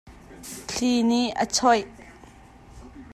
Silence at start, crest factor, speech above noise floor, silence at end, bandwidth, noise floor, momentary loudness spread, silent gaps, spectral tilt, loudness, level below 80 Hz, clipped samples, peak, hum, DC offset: 0.05 s; 18 dB; 27 dB; 0 s; 14 kHz; -49 dBFS; 21 LU; none; -3 dB/octave; -23 LUFS; -52 dBFS; under 0.1%; -8 dBFS; none; under 0.1%